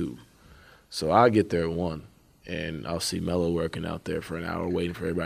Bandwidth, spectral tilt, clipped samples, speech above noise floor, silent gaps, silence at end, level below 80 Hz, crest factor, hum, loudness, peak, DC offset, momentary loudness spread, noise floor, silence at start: 15.5 kHz; -5.5 dB/octave; under 0.1%; 27 dB; none; 0 s; -50 dBFS; 22 dB; none; -27 LUFS; -4 dBFS; under 0.1%; 15 LU; -53 dBFS; 0 s